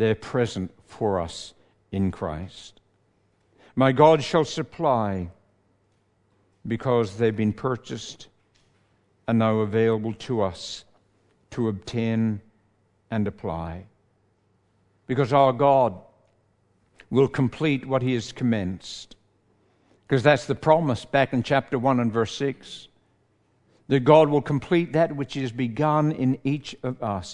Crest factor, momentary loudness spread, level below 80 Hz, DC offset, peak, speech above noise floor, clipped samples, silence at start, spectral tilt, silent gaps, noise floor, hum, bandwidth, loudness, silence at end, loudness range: 22 dB; 17 LU; -58 dBFS; under 0.1%; -2 dBFS; 43 dB; under 0.1%; 0 s; -7 dB/octave; none; -66 dBFS; none; 10.5 kHz; -24 LUFS; 0 s; 7 LU